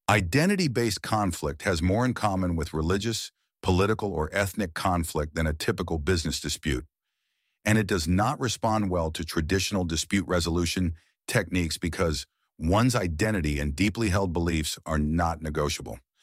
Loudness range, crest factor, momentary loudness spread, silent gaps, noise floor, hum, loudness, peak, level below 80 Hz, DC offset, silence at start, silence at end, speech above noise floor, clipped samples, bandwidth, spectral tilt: 2 LU; 22 dB; 6 LU; none; -80 dBFS; none; -27 LUFS; -6 dBFS; -40 dBFS; under 0.1%; 0.1 s; 0.25 s; 54 dB; under 0.1%; 16 kHz; -5 dB/octave